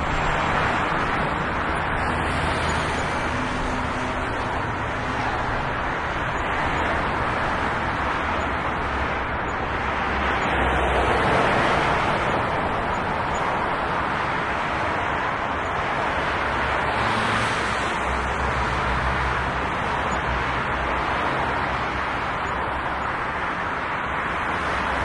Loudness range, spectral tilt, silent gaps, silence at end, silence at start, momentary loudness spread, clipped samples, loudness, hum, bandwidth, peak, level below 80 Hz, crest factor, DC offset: 3 LU; -5 dB/octave; none; 0 s; 0 s; 4 LU; under 0.1%; -23 LUFS; none; 11.5 kHz; -8 dBFS; -36 dBFS; 16 dB; under 0.1%